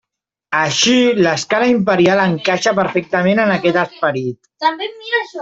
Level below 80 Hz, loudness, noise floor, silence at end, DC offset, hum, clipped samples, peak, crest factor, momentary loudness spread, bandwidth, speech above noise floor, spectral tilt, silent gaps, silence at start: -56 dBFS; -15 LUFS; -83 dBFS; 0 s; under 0.1%; none; under 0.1%; -2 dBFS; 14 dB; 7 LU; 8 kHz; 68 dB; -4 dB/octave; none; 0.5 s